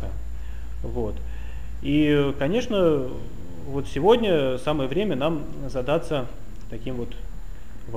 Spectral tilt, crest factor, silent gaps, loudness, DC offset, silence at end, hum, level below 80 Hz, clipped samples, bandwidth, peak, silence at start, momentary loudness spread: -7 dB/octave; 18 dB; none; -24 LUFS; 3%; 0 s; none; -36 dBFS; under 0.1%; 15.5 kHz; -6 dBFS; 0 s; 20 LU